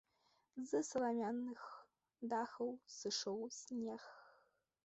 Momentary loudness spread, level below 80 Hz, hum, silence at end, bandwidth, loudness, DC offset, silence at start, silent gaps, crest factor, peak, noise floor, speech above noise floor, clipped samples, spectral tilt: 16 LU; -86 dBFS; none; 0.55 s; 8.2 kHz; -44 LUFS; under 0.1%; 0.55 s; none; 18 dB; -28 dBFS; -80 dBFS; 36 dB; under 0.1%; -3.5 dB/octave